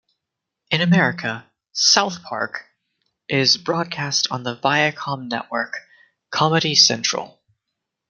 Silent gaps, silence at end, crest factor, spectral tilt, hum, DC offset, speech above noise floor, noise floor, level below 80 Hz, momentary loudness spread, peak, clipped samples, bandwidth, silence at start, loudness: none; 0.8 s; 20 dB; -3 dB/octave; none; under 0.1%; 62 dB; -82 dBFS; -66 dBFS; 14 LU; -2 dBFS; under 0.1%; 11 kHz; 0.7 s; -19 LUFS